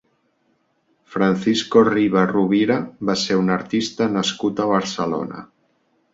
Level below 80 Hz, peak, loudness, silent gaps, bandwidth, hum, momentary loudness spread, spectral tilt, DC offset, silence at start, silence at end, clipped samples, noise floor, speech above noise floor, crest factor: -58 dBFS; -2 dBFS; -19 LUFS; none; 8 kHz; none; 8 LU; -5.5 dB/octave; under 0.1%; 1.1 s; 0.7 s; under 0.1%; -65 dBFS; 47 dB; 18 dB